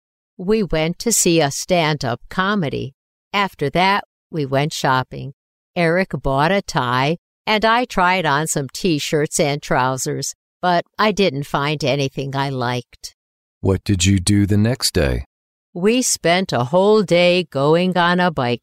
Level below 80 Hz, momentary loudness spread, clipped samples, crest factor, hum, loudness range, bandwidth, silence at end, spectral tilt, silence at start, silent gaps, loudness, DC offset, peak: -40 dBFS; 10 LU; under 0.1%; 16 dB; none; 4 LU; 16 kHz; 0.05 s; -4.5 dB/octave; 0.4 s; 2.94-3.31 s, 4.05-4.30 s, 5.33-5.74 s, 7.18-7.45 s, 10.35-10.60 s, 13.14-13.61 s, 15.26-15.73 s; -18 LUFS; under 0.1%; -2 dBFS